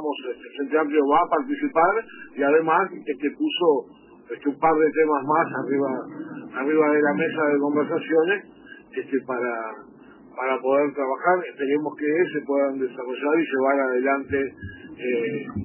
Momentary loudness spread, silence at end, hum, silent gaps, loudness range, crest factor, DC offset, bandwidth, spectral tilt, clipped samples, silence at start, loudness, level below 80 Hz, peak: 12 LU; 0 s; none; none; 3 LU; 16 dB; under 0.1%; 3.1 kHz; -9.5 dB/octave; under 0.1%; 0 s; -23 LUFS; -62 dBFS; -6 dBFS